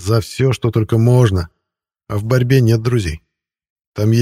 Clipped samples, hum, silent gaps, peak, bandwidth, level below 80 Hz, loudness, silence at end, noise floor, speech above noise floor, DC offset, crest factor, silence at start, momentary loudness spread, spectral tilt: under 0.1%; none; 3.70-3.76 s, 3.87-3.92 s; 0 dBFS; 15 kHz; -38 dBFS; -16 LUFS; 0 s; -80 dBFS; 66 dB; under 0.1%; 16 dB; 0 s; 13 LU; -7 dB/octave